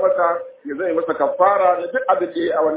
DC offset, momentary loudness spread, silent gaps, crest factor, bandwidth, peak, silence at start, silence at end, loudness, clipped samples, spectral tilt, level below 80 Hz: under 0.1%; 9 LU; none; 16 dB; 4 kHz; -2 dBFS; 0 s; 0 s; -19 LUFS; under 0.1%; -8.5 dB/octave; -64 dBFS